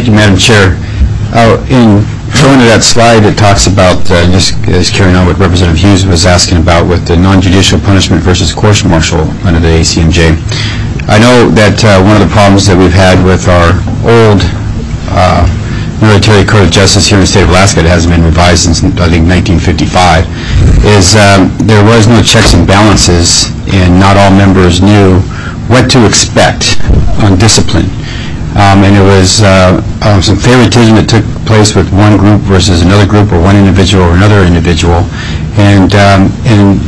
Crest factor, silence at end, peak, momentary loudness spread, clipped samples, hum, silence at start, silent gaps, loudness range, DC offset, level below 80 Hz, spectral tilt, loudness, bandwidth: 4 dB; 0 s; 0 dBFS; 6 LU; 4%; none; 0 s; none; 2 LU; 5%; -16 dBFS; -5 dB/octave; -5 LUFS; 11 kHz